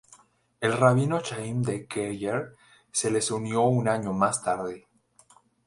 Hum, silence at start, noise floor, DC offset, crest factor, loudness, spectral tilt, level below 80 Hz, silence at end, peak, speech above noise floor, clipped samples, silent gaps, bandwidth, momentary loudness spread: none; 0.6 s; -60 dBFS; under 0.1%; 22 dB; -26 LUFS; -5 dB/octave; -62 dBFS; 0.9 s; -6 dBFS; 34 dB; under 0.1%; none; 11.5 kHz; 10 LU